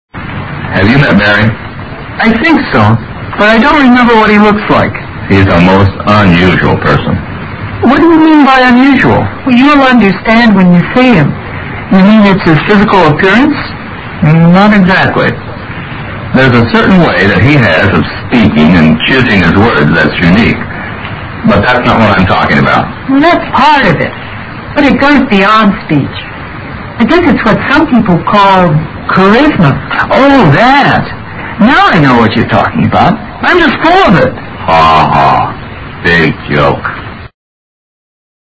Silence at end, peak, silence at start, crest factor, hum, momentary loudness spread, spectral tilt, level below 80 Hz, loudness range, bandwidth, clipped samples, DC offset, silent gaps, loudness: 1.3 s; 0 dBFS; 0.15 s; 6 dB; none; 15 LU; -7.5 dB/octave; -28 dBFS; 3 LU; 8 kHz; 3%; under 0.1%; none; -6 LUFS